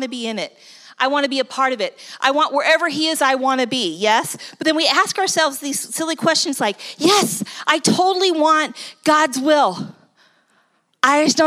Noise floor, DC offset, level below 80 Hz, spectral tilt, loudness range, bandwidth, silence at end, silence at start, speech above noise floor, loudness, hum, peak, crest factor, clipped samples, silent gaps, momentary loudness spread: -62 dBFS; under 0.1%; -76 dBFS; -2.5 dB/octave; 2 LU; 16 kHz; 0 s; 0 s; 44 dB; -17 LUFS; none; 0 dBFS; 18 dB; under 0.1%; none; 9 LU